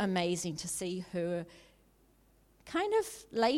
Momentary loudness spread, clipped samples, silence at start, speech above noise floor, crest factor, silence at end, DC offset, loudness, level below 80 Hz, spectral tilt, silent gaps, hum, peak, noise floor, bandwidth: 7 LU; under 0.1%; 0 s; 33 dB; 18 dB; 0 s; under 0.1%; -35 LUFS; -66 dBFS; -4.5 dB/octave; none; none; -16 dBFS; -66 dBFS; 16.5 kHz